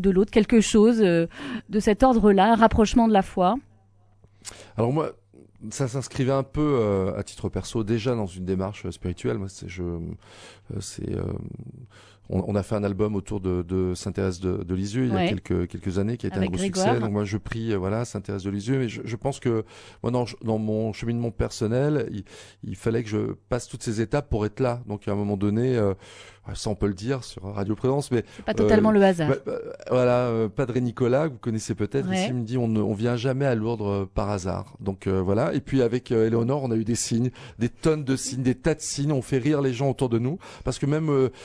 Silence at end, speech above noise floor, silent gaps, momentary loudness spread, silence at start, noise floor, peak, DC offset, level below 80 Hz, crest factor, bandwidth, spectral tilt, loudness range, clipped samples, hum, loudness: 0 s; 33 dB; none; 13 LU; 0 s; -57 dBFS; -4 dBFS; under 0.1%; -44 dBFS; 20 dB; 11 kHz; -6.5 dB/octave; 8 LU; under 0.1%; none; -25 LUFS